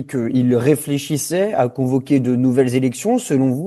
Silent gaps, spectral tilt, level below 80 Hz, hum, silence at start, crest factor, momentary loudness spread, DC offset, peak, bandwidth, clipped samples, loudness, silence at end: none; -6.5 dB/octave; -58 dBFS; none; 0 s; 16 dB; 4 LU; under 0.1%; -2 dBFS; 12.5 kHz; under 0.1%; -18 LUFS; 0 s